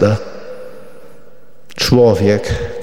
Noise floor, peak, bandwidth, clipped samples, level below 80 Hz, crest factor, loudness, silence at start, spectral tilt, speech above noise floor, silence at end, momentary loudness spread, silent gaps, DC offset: -47 dBFS; 0 dBFS; 16.5 kHz; under 0.1%; -34 dBFS; 16 dB; -14 LUFS; 0 s; -6 dB/octave; 34 dB; 0 s; 23 LU; none; 3%